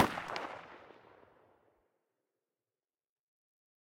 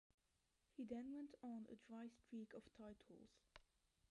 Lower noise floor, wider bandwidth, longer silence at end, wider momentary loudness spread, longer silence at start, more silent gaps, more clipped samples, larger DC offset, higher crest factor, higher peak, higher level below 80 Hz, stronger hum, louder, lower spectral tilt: about the same, under -90 dBFS vs -87 dBFS; first, 16.5 kHz vs 11 kHz; first, 3 s vs 0.5 s; first, 23 LU vs 14 LU; second, 0 s vs 0.75 s; neither; neither; neither; first, 28 dB vs 18 dB; first, -14 dBFS vs -40 dBFS; first, -74 dBFS vs -84 dBFS; neither; first, -39 LUFS vs -57 LUFS; second, -4 dB/octave vs -6.5 dB/octave